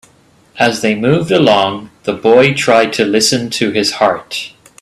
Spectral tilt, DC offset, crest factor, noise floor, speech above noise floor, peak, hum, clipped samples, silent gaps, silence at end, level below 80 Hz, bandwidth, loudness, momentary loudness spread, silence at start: -4 dB/octave; under 0.1%; 14 dB; -49 dBFS; 37 dB; 0 dBFS; none; under 0.1%; none; 0.35 s; -52 dBFS; 13.5 kHz; -12 LUFS; 12 LU; 0.55 s